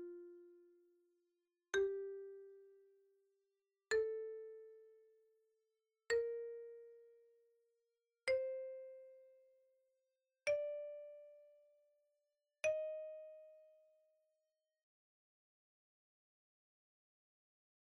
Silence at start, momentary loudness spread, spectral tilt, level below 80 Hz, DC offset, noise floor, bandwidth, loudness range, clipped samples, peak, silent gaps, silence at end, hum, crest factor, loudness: 0 s; 22 LU; -1 dB/octave; -84 dBFS; under 0.1%; -90 dBFS; 4.8 kHz; 4 LU; under 0.1%; -26 dBFS; none; 4.15 s; none; 22 dB; -43 LUFS